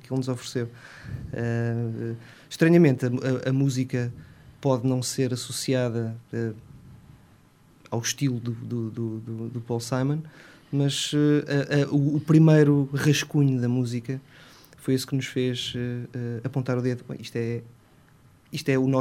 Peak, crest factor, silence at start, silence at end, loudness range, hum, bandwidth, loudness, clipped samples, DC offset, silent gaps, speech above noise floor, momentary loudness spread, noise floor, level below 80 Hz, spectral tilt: -6 dBFS; 20 dB; 0.05 s; 0 s; 9 LU; none; 15.5 kHz; -25 LUFS; under 0.1%; under 0.1%; none; 32 dB; 14 LU; -56 dBFS; -60 dBFS; -6 dB/octave